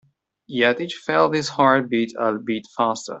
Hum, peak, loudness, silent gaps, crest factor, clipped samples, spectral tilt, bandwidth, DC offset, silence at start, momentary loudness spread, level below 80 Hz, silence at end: none; -4 dBFS; -21 LUFS; none; 18 dB; under 0.1%; -4.5 dB/octave; 8.2 kHz; under 0.1%; 0.5 s; 9 LU; -66 dBFS; 0 s